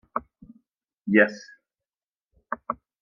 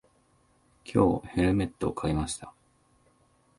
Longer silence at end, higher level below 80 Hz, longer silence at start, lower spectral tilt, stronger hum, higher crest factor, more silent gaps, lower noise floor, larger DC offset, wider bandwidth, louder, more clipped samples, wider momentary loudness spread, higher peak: second, 0.3 s vs 1.1 s; second, -66 dBFS vs -46 dBFS; second, 0.15 s vs 0.85 s; about the same, -6.5 dB/octave vs -6.5 dB/octave; neither; about the same, 26 dB vs 22 dB; first, 2.06-2.13 s, 2.23-2.28 s vs none; first, under -90 dBFS vs -66 dBFS; neither; second, 7.2 kHz vs 11.5 kHz; first, -25 LUFS vs -28 LUFS; neither; first, 18 LU vs 15 LU; first, -4 dBFS vs -10 dBFS